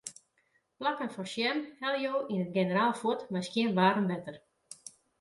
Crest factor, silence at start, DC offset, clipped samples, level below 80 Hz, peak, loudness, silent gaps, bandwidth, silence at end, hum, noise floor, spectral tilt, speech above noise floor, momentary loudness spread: 20 dB; 0.05 s; under 0.1%; under 0.1%; -76 dBFS; -12 dBFS; -31 LUFS; none; 11.5 kHz; 0.3 s; none; -74 dBFS; -5 dB/octave; 43 dB; 21 LU